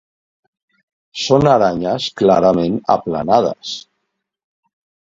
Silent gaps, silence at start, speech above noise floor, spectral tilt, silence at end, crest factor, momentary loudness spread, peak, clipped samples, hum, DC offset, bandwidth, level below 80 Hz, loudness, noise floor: none; 1.15 s; 60 dB; -6 dB/octave; 1.25 s; 18 dB; 15 LU; 0 dBFS; under 0.1%; none; under 0.1%; 7.8 kHz; -48 dBFS; -15 LUFS; -74 dBFS